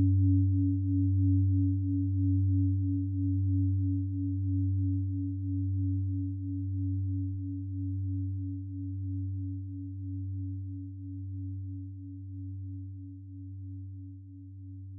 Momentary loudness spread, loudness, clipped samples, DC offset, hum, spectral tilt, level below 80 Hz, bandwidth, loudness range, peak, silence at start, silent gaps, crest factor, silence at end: 16 LU; -32 LUFS; under 0.1%; under 0.1%; none; -16 dB/octave; -64 dBFS; 0.4 kHz; 13 LU; -18 dBFS; 0 s; none; 12 dB; 0 s